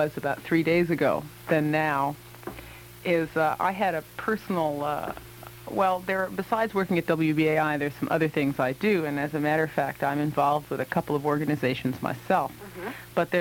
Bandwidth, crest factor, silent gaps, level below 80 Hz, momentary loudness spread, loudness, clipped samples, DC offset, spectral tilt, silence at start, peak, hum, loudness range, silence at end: 18 kHz; 18 dB; none; -58 dBFS; 11 LU; -26 LUFS; under 0.1%; under 0.1%; -6.5 dB/octave; 0 s; -8 dBFS; none; 3 LU; 0 s